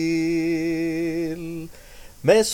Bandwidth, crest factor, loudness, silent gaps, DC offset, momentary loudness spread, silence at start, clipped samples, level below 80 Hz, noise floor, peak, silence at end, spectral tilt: 17 kHz; 18 dB; -24 LUFS; none; under 0.1%; 15 LU; 0 s; under 0.1%; -48 dBFS; -43 dBFS; -4 dBFS; 0 s; -5 dB/octave